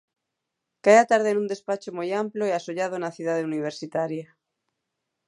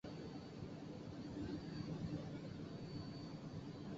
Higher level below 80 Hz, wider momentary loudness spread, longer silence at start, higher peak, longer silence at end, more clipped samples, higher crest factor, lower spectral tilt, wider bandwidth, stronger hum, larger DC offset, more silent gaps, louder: second, -80 dBFS vs -66 dBFS; first, 13 LU vs 5 LU; first, 0.85 s vs 0.05 s; first, -4 dBFS vs -32 dBFS; first, 1.05 s vs 0 s; neither; first, 22 dB vs 16 dB; second, -5 dB/octave vs -7 dB/octave; first, 11.5 kHz vs 7.6 kHz; neither; neither; neither; first, -24 LUFS vs -50 LUFS